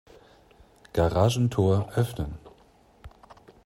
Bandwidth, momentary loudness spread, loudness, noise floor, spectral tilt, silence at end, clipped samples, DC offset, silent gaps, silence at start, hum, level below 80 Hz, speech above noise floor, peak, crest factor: 16 kHz; 13 LU; -26 LUFS; -58 dBFS; -7 dB/octave; 0.35 s; under 0.1%; under 0.1%; none; 0.95 s; none; -46 dBFS; 34 dB; -8 dBFS; 20 dB